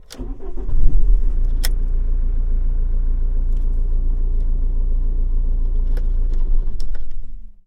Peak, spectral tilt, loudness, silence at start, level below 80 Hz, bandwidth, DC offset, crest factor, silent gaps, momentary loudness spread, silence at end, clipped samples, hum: 0 dBFS; -6 dB/octave; -25 LUFS; 0.1 s; -16 dBFS; 10.5 kHz; under 0.1%; 14 dB; none; 10 LU; 0.15 s; under 0.1%; none